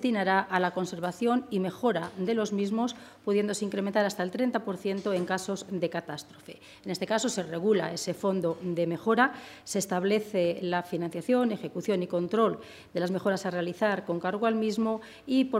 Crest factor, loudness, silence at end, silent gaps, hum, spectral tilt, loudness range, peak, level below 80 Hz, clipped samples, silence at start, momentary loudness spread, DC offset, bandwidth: 20 dB; -29 LUFS; 0 s; none; none; -5 dB/octave; 3 LU; -10 dBFS; -72 dBFS; under 0.1%; 0 s; 7 LU; under 0.1%; 16 kHz